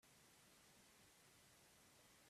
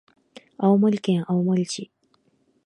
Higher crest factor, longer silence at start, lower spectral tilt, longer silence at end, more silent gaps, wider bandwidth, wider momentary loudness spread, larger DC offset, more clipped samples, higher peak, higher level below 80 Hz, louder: about the same, 14 dB vs 18 dB; second, 0 s vs 0.6 s; second, -2 dB/octave vs -7 dB/octave; second, 0 s vs 0.8 s; neither; first, 15 kHz vs 10.5 kHz; second, 0 LU vs 13 LU; neither; neither; second, -58 dBFS vs -6 dBFS; second, -90 dBFS vs -72 dBFS; second, -69 LUFS vs -22 LUFS